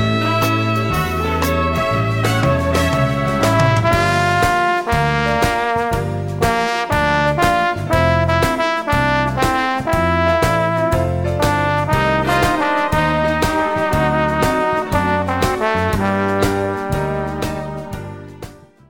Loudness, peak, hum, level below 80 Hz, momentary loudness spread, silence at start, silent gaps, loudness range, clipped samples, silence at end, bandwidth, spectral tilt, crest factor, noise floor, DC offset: -17 LUFS; -4 dBFS; none; -32 dBFS; 6 LU; 0 s; none; 2 LU; under 0.1%; 0.35 s; 18 kHz; -5.5 dB/octave; 14 dB; -37 dBFS; under 0.1%